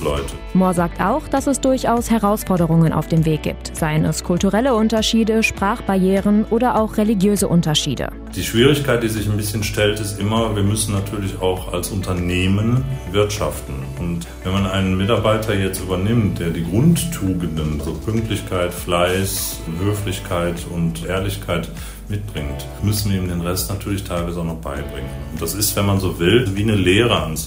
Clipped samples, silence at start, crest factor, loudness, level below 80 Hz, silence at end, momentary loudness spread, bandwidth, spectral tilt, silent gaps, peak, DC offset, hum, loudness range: under 0.1%; 0 s; 18 dB; -19 LUFS; -34 dBFS; 0 s; 10 LU; 16 kHz; -5.5 dB/octave; none; 0 dBFS; under 0.1%; none; 6 LU